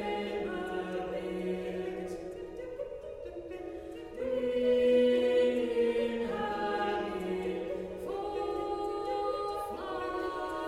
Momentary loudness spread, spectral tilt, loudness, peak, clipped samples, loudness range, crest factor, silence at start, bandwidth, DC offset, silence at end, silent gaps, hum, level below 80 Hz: 15 LU; -6 dB/octave; -33 LUFS; -16 dBFS; under 0.1%; 9 LU; 16 dB; 0 s; 13.5 kHz; under 0.1%; 0 s; none; none; -58 dBFS